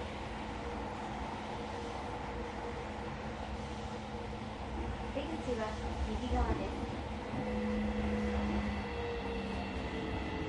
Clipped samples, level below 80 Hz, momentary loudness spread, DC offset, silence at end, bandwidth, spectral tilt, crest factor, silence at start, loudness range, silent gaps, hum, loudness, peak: under 0.1%; -44 dBFS; 7 LU; under 0.1%; 0 s; 11 kHz; -6.5 dB/octave; 18 dB; 0 s; 5 LU; none; none; -39 LUFS; -20 dBFS